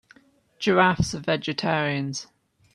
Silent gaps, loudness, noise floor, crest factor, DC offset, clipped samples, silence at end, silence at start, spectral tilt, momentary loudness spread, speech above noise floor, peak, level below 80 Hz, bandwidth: none; -24 LUFS; -57 dBFS; 22 dB; under 0.1%; under 0.1%; 0.5 s; 0.6 s; -5 dB/octave; 10 LU; 34 dB; -4 dBFS; -52 dBFS; 12 kHz